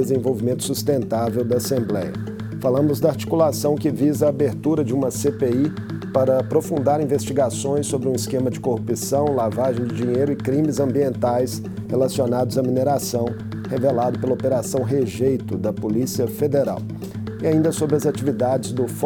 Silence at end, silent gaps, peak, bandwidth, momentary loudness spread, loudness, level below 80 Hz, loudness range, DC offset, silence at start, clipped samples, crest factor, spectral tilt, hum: 0 s; none; -4 dBFS; 19.5 kHz; 6 LU; -21 LUFS; -52 dBFS; 2 LU; under 0.1%; 0 s; under 0.1%; 16 dB; -6.5 dB/octave; none